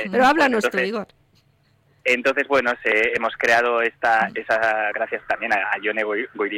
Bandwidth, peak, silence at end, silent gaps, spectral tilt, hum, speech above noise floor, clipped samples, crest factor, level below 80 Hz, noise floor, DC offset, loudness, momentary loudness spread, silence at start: 16.5 kHz; -6 dBFS; 0 s; none; -4 dB/octave; none; 40 dB; under 0.1%; 14 dB; -60 dBFS; -61 dBFS; under 0.1%; -20 LUFS; 8 LU; 0 s